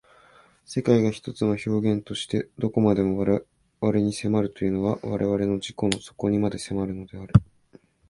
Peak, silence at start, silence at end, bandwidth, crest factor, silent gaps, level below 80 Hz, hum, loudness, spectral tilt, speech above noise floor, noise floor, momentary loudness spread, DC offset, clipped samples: 0 dBFS; 0.7 s; 0.65 s; 11.5 kHz; 24 dB; none; -46 dBFS; none; -25 LUFS; -7 dB/octave; 32 dB; -56 dBFS; 7 LU; under 0.1%; under 0.1%